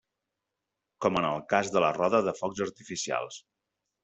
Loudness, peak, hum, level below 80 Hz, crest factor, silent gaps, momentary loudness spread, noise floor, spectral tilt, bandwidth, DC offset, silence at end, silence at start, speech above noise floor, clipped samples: -29 LUFS; -8 dBFS; none; -68 dBFS; 22 dB; none; 10 LU; -86 dBFS; -4 dB/octave; 8.2 kHz; under 0.1%; 0.65 s; 1 s; 57 dB; under 0.1%